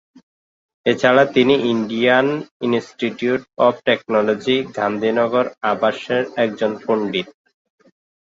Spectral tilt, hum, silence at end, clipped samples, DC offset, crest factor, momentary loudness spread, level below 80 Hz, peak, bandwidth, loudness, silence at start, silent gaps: -6 dB/octave; none; 1.05 s; under 0.1%; under 0.1%; 18 dB; 8 LU; -62 dBFS; -2 dBFS; 7.8 kHz; -18 LUFS; 0.85 s; 2.51-2.60 s